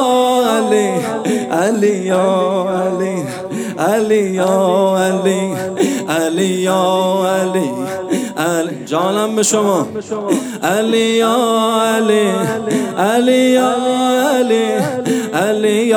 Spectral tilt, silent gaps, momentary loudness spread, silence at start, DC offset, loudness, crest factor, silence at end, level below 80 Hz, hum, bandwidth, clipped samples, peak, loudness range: -4.5 dB/octave; none; 6 LU; 0 s; under 0.1%; -15 LUFS; 14 dB; 0 s; -62 dBFS; none; over 20 kHz; under 0.1%; 0 dBFS; 3 LU